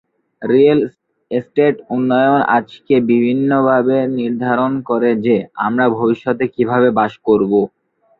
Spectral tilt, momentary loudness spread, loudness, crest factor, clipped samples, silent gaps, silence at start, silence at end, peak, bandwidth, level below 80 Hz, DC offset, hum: -9.5 dB/octave; 6 LU; -15 LUFS; 14 dB; under 0.1%; none; 0.4 s; 0.55 s; -2 dBFS; 4.6 kHz; -58 dBFS; under 0.1%; none